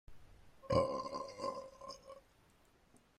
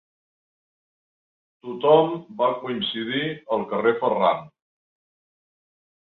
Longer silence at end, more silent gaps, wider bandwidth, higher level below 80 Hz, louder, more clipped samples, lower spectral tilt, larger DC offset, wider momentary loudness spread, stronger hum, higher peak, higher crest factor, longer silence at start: second, 0.2 s vs 1.65 s; neither; first, 12.5 kHz vs 4.3 kHz; first, -64 dBFS vs -70 dBFS; second, -40 LUFS vs -23 LUFS; neither; second, -6 dB/octave vs -8 dB/octave; neither; first, 23 LU vs 9 LU; neither; second, -20 dBFS vs -4 dBFS; about the same, 22 dB vs 22 dB; second, 0.1 s vs 1.65 s